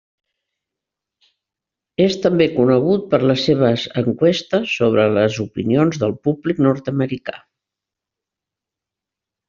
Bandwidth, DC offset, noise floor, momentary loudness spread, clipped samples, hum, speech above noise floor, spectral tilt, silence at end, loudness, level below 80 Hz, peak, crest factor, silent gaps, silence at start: 7.4 kHz; under 0.1%; -86 dBFS; 7 LU; under 0.1%; none; 69 dB; -5.5 dB/octave; 2.1 s; -17 LUFS; -56 dBFS; -2 dBFS; 16 dB; none; 2 s